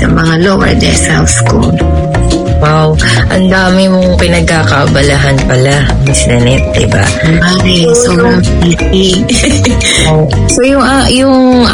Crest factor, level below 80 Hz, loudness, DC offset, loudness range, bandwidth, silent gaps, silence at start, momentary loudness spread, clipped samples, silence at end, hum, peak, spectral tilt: 6 dB; -18 dBFS; -7 LUFS; under 0.1%; 1 LU; 12 kHz; none; 0 s; 2 LU; 1%; 0 s; none; 0 dBFS; -5 dB/octave